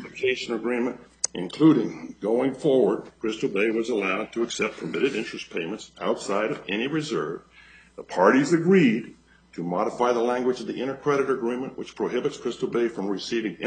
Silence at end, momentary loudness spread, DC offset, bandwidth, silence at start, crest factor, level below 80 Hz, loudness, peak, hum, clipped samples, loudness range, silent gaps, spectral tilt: 0 s; 12 LU; under 0.1%; 9.4 kHz; 0 s; 20 dB; -64 dBFS; -25 LUFS; -4 dBFS; none; under 0.1%; 5 LU; none; -5 dB/octave